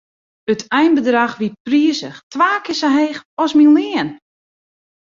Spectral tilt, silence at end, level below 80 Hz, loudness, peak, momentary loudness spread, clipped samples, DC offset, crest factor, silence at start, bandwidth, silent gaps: -4.5 dB/octave; 0.9 s; -62 dBFS; -16 LUFS; 0 dBFS; 13 LU; under 0.1%; under 0.1%; 16 dB; 0.5 s; 7.6 kHz; 1.60-1.65 s, 2.23-2.31 s, 3.25-3.37 s